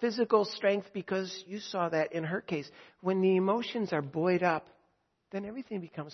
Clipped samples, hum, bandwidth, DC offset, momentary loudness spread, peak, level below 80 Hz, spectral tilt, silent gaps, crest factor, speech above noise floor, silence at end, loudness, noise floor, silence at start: under 0.1%; none; 6.4 kHz; under 0.1%; 12 LU; -12 dBFS; -76 dBFS; -6.5 dB/octave; none; 20 dB; 43 dB; 0 s; -32 LUFS; -74 dBFS; 0 s